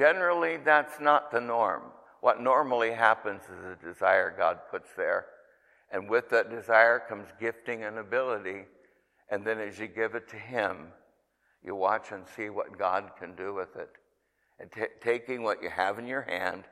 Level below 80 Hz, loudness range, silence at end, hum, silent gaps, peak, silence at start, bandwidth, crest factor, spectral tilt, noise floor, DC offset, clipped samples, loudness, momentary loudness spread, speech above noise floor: -76 dBFS; 8 LU; 0.1 s; none; none; -6 dBFS; 0 s; 13.5 kHz; 24 dB; -5 dB/octave; -74 dBFS; under 0.1%; under 0.1%; -29 LUFS; 16 LU; 45 dB